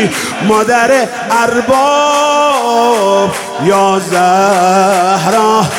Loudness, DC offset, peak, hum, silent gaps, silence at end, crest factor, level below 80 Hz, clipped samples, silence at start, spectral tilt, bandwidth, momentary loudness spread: -10 LUFS; under 0.1%; 0 dBFS; none; none; 0 s; 10 dB; -50 dBFS; under 0.1%; 0 s; -4 dB/octave; 17.5 kHz; 4 LU